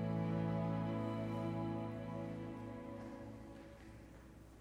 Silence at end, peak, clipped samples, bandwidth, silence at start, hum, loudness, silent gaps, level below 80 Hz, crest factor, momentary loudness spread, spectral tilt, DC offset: 0 s; -28 dBFS; under 0.1%; 10.5 kHz; 0 s; none; -43 LUFS; none; -62 dBFS; 14 dB; 18 LU; -8.5 dB/octave; under 0.1%